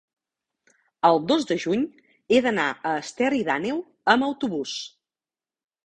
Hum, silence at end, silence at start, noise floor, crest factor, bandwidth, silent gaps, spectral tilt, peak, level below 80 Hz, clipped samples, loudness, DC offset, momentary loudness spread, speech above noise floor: none; 1 s; 1.05 s; under -90 dBFS; 22 dB; 9.6 kHz; none; -4.5 dB/octave; -2 dBFS; -64 dBFS; under 0.1%; -24 LUFS; under 0.1%; 9 LU; over 67 dB